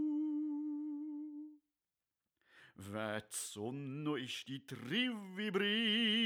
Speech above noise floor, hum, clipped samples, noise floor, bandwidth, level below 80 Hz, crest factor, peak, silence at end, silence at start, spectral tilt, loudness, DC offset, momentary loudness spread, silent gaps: over 51 dB; none; under 0.1%; under -90 dBFS; over 20 kHz; -88 dBFS; 16 dB; -24 dBFS; 0 s; 0 s; -3.5 dB/octave; -39 LUFS; under 0.1%; 14 LU; none